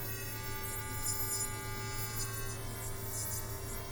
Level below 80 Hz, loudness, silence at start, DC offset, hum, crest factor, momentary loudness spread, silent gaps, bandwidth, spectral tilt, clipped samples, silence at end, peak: -48 dBFS; -37 LUFS; 0 s; under 0.1%; none; 16 dB; 7 LU; none; over 20 kHz; -3 dB/octave; under 0.1%; 0 s; -22 dBFS